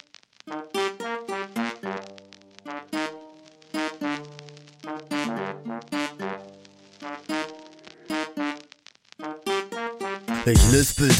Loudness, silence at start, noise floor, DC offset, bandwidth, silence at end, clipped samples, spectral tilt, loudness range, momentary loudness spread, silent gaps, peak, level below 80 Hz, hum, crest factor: -27 LUFS; 0.45 s; -53 dBFS; under 0.1%; 16 kHz; 0 s; under 0.1%; -4.5 dB/octave; 8 LU; 24 LU; none; -4 dBFS; -34 dBFS; none; 24 dB